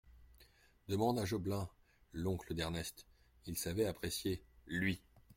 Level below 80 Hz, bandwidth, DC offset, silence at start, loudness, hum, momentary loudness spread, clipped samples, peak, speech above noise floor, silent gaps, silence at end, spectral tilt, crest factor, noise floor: -60 dBFS; 16.5 kHz; under 0.1%; 0.05 s; -40 LUFS; none; 13 LU; under 0.1%; -22 dBFS; 28 dB; none; 0.05 s; -5 dB/octave; 20 dB; -67 dBFS